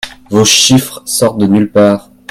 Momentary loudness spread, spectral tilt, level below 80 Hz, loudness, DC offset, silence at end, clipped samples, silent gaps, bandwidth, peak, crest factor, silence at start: 9 LU; -3.5 dB/octave; -44 dBFS; -9 LUFS; under 0.1%; 0.3 s; 0.3%; none; 18.5 kHz; 0 dBFS; 10 dB; 0.05 s